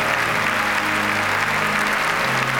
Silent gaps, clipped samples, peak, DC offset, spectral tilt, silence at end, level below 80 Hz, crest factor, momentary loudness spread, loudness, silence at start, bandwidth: none; under 0.1%; -6 dBFS; under 0.1%; -3 dB/octave; 0 s; -48 dBFS; 14 dB; 0 LU; -19 LUFS; 0 s; 17 kHz